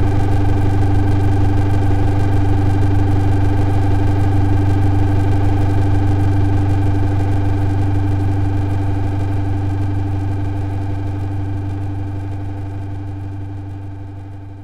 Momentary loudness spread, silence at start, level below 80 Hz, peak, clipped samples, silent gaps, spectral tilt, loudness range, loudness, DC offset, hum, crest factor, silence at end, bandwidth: 10 LU; 0 s; -22 dBFS; -4 dBFS; under 0.1%; none; -9 dB/octave; 7 LU; -18 LUFS; 8%; none; 12 dB; 0 s; 5.8 kHz